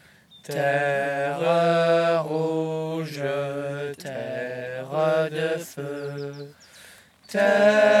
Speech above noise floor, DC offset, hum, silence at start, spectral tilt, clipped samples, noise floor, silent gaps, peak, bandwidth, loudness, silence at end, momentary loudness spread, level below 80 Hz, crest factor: 28 dB; under 0.1%; none; 0.35 s; -5.5 dB/octave; under 0.1%; -50 dBFS; none; -6 dBFS; 14.5 kHz; -24 LUFS; 0 s; 14 LU; -74 dBFS; 18 dB